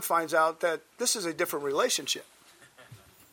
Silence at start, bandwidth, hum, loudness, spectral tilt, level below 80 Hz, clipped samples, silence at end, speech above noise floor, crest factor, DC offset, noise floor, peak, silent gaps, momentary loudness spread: 0 s; 18 kHz; none; -28 LUFS; -1.5 dB/octave; -76 dBFS; under 0.1%; 0.35 s; 27 dB; 18 dB; under 0.1%; -55 dBFS; -12 dBFS; none; 6 LU